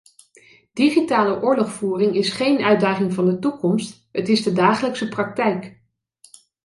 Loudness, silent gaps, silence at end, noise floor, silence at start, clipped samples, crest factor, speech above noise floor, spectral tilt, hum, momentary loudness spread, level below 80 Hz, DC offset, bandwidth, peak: -20 LUFS; none; 0.95 s; -55 dBFS; 0.75 s; under 0.1%; 16 dB; 36 dB; -6 dB/octave; none; 8 LU; -64 dBFS; under 0.1%; 11.5 kHz; -4 dBFS